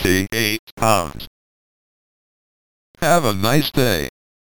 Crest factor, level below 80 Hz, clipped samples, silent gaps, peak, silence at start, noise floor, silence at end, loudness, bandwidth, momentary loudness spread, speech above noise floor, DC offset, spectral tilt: 20 dB; -42 dBFS; under 0.1%; 0.59-0.77 s, 1.27-2.94 s; 0 dBFS; 0 s; under -90 dBFS; 0.35 s; -18 LUFS; 19 kHz; 14 LU; over 72 dB; under 0.1%; -4.5 dB/octave